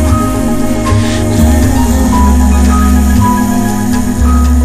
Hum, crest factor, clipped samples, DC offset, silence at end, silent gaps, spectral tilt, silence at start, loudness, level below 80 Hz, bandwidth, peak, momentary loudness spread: none; 8 dB; 0.4%; under 0.1%; 0 s; none; -6 dB/octave; 0 s; -10 LUFS; -12 dBFS; 15.5 kHz; 0 dBFS; 4 LU